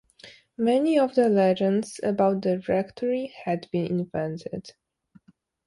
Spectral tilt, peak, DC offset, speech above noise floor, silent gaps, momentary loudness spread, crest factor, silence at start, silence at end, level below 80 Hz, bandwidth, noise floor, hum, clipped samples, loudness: -7 dB/octave; -8 dBFS; under 0.1%; 34 dB; none; 11 LU; 16 dB; 0.25 s; 0.95 s; -64 dBFS; 11.5 kHz; -58 dBFS; none; under 0.1%; -25 LUFS